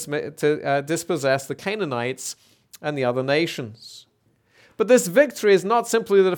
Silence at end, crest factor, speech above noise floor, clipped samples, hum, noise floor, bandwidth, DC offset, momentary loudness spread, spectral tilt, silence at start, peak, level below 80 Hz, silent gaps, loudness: 0 s; 18 dB; 42 dB; under 0.1%; none; -63 dBFS; 19 kHz; under 0.1%; 15 LU; -4.5 dB/octave; 0 s; -4 dBFS; -72 dBFS; none; -22 LUFS